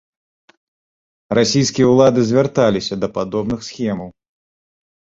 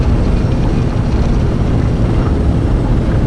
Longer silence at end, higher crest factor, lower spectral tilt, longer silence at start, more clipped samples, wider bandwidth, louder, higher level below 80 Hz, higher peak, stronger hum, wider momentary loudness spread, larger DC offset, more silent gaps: first, 0.95 s vs 0 s; first, 16 dB vs 10 dB; second, -5.5 dB/octave vs -8.5 dB/octave; first, 1.3 s vs 0 s; neither; second, 7.8 kHz vs 11 kHz; about the same, -16 LUFS vs -15 LUFS; second, -50 dBFS vs -16 dBFS; about the same, -2 dBFS vs -2 dBFS; neither; first, 11 LU vs 1 LU; neither; neither